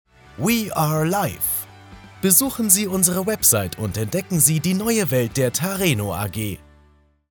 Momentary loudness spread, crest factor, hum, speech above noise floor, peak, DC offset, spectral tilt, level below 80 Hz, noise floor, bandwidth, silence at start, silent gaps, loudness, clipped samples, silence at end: 10 LU; 22 dB; none; 36 dB; 0 dBFS; under 0.1%; -4 dB/octave; -50 dBFS; -56 dBFS; 19.5 kHz; 0.35 s; none; -19 LUFS; under 0.1%; 0.75 s